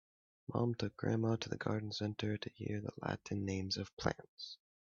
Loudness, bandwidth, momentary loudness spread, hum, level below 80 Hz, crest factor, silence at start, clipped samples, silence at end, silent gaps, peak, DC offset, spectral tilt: -40 LUFS; 7.4 kHz; 12 LU; none; -68 dBFS; 22 dB; 0.5 s; under 0.1%; 0.45 s; 3.93-3.97 s, 4.28-4.37 s; -18 dBFS; under 0.1%; -5.5 dB/octave